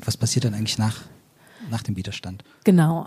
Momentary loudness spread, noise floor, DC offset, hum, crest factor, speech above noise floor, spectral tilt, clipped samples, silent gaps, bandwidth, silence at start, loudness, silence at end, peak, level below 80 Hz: 18 LU; -45 dBFS; under 0.1%; none; 20 dB; 23 dB; -5.5 dB/octave; under 0.1%; none; 15.5 kHz; 0 s; -23 LUFS; 0 s; -4 dBFS; -56 dBFS